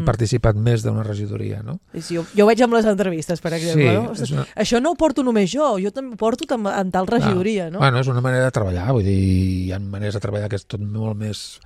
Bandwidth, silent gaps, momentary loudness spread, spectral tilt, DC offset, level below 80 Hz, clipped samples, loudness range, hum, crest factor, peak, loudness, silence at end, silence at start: 13 kHz; none; 10 LU; -6.5 dB/octave; under 0.1%; -40 dBFS; under 0.1%; 2 LU; none; 18 dB; -2 dBFS; -20 LUFS; 0.1 s; 0 s